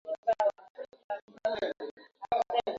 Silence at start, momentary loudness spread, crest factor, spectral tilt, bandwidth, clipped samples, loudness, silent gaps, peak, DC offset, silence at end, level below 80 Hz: 0.05 s; 18 LU; 18 dB; -4 dB/octave; 7.6 kHz; under 0.1%; -33 LUFS; 0.18-0.23 s, 0.70-0.75 s, 1.04-1.09 s, 1.22-1.28 s, 1.91-1.97 s; -16 dBFS; under 0.1%; 0 s; -70 dBFS